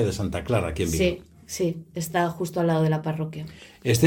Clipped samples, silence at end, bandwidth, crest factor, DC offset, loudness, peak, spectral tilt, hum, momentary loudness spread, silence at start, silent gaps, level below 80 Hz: under 0.1%; 0 s; 17.5 kHz; 18 dB; under 0.1%; -26 LUFS; -6 dBFS; -5.5 dB/octave; none; 11 LU; 0 s; none; -46 dBFS